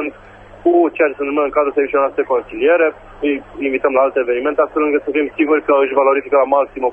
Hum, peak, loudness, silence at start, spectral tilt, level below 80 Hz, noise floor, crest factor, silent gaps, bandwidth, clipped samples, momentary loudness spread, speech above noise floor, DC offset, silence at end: none; 0 dBFS; -16 LUFS; 0 s; -7.5 dB/octave; -50 dBFS; -39 dBFS; 14 dB; none; 3.5 kHz; under 0.1%; 7 LU; 24 dB; under 0.1%; 0 s